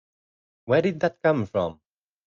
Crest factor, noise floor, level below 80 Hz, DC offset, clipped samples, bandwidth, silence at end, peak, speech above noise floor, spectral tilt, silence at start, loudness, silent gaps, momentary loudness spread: 20 dB; under -90 dBFS; -64 dBFS; under 0.1%; under 0.1%; 7.2 kHz; 0.55 s; -6 dBFS; over 67 dB; -7.5 dB/octave; 0.65 s; -24 LUFS; none; 6 LU